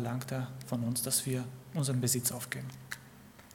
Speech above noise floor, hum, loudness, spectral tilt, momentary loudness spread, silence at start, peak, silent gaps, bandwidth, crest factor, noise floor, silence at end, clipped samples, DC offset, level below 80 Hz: 20 dB; none; -34 LUFS; -4 dB/octave; 15 LU; 0 s; -16 dBFS; none; 18 kHz; 20 dB; -55 dBFS; 0 s; under 0.1%; under 0.1%; -70 dBFS